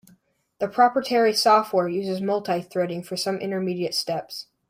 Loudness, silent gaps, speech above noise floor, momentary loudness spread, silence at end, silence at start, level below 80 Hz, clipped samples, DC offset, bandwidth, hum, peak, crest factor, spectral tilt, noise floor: -23 LUFS; none; 38 dB; 10 LU; 0.25 s; 0.6 s; -70 dBFS; under 0.1%; under 0.1%; 16 kHz; none; -6 dBFS; 18 dB; -4.5 dB/octave; -61 dBFS